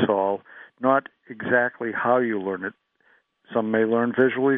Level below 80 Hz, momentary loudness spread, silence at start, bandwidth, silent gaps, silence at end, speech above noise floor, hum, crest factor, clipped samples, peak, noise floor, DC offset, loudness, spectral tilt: -72 dBFS; 11 LU; 0 s; 3.8 kHz; none; 0 s; 40 dB; none; 18 dB; under 0.1%; -6 dBFS; -63 dBFS; under 0.1%; -23 LUFS; -4.5 dB/octave